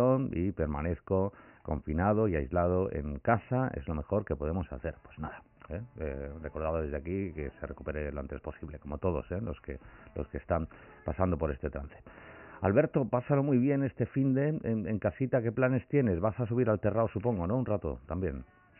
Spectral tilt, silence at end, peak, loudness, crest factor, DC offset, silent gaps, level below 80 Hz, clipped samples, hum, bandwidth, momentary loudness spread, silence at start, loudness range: -6 dB/octave; 0.35 s; -12 dBFS; -32 LUFS; 20 dB; under 0.1%; none; -48 dBFS; under 0.1%; none; 3.1 kHz; 15 LU; 0 s; 8 LU